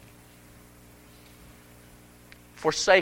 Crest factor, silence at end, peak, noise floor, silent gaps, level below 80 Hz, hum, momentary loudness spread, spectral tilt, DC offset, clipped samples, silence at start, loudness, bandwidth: 26 dB; 0 s; -4 dBFS; -52 dBFS; none; -58 dBFS; 60 Hz at -55 dBFS; 25 LU; -2.5 dB/octave; under 0.1%; under 0.1%; 2.6 s; -25 LUFS; 16.5 kHz